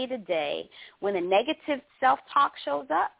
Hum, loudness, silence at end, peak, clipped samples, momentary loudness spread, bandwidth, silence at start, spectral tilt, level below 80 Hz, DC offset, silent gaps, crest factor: none; -27 LUFS; 0.1 s; -10 dBFS; under 0.1%; 9 LU; 4 kHz; 0 s; -7.5 dB/octave; -72 dBFS; under 0.1%; none; 18 dB